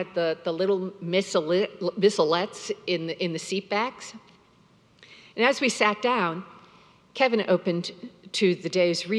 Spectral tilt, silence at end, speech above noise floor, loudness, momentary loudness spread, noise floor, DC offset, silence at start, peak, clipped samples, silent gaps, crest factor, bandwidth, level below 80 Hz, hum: -4.5 dB/octave; 0 s; 34 dB; -25 LUFS; 10 LU; -59 dBFS; under 0.1%; 0 s; -6 dBFS; under 0.1%; none; 22 dB; 12 kHz; -76 dBFS; none